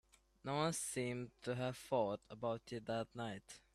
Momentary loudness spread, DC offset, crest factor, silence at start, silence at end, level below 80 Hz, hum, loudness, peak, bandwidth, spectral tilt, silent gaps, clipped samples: 8 LU; under 0.1%; 18 dB; 0.45 s; 0.15 s; -72 dBFS; none; -43 LUFS; -24 dBFS; 15 kHz; -4.5 dB/octave; none; under 0.1%